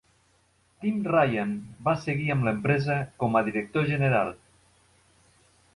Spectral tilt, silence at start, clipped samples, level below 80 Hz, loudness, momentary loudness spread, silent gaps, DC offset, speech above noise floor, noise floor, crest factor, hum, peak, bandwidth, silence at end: -8 dB/octave; 0.8 s; under 0.1%; -58 dBFS; -26 LUFS; 7 LU; none; under 0.1%; 40 dB; -65 dBFS; 18 dB; none; -10 dBFS; 11.5 kHz; 1.4 s